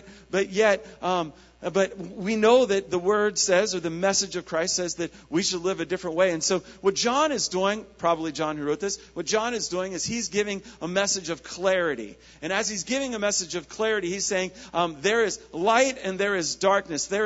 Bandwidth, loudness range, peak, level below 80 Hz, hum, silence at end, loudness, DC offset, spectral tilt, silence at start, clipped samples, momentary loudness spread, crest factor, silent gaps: 8 kHz; 4 LU; -6 dBFS; -58 dBFS; none; 0 s; -25 LUFS; under 0.1%; -3 dB/octave; 0 s; under 0.1%; 7 LU; 20 dB; none